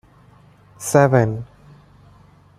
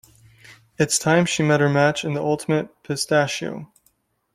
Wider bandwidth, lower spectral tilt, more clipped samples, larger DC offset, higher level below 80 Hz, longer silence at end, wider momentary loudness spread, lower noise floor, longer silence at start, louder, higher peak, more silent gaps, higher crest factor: about the same, 15.5 kHz vs 15.5 kHz; first, -6.5 dB/octave vs -4.5 dB/octave; neither; neither; first, -52 dBFS vs -58 dBFS; first, 1.15 s vs 0.7 s; first, 18 LU vs 11 LU; second, -50 dBFS vs -65 dBFS; first, 0.8 s vs 0.5 s; first, -17 LUFS vs -20 LUFS; about the same, -2 dBFS vs -4 dBFS; neither; about the same, 20 dB vs 18 dB